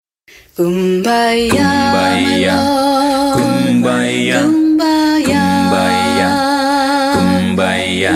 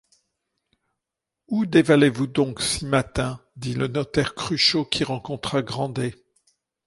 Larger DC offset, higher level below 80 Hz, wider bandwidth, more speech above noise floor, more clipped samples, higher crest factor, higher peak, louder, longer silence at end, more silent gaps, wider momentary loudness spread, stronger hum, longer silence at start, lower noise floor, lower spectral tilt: neither; about the same, -44 dBFS vs -48 dBFS; first, 15.5 kHz vs 11.5 kHz; second, 33 dB vs 63 dB; neither; second, 12 dB vs 20 dB; first, 0 dBFS vs -4 dBFS; first, -12 LUFS vs -23 LUFS; second, 0 s vs 0.75 s; neither; second, 2 LU vs 11 LU; neither; second, 0.6 s vs 1.5 s; second, -44 dBFS vs -85 dBFS; about the same, -5 dB/octave vs -5 dB/octave